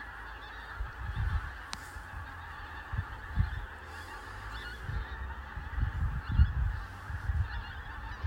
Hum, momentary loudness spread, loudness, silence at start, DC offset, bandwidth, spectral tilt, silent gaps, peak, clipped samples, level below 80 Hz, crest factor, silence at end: none; 11 LU; -38 LUFS; 0 s; under 0.1%; 15.5 kHz; -6 dB/octave; none; -12 dBFS; under 0.1%; -38 dBFS; 24 dB; 0 s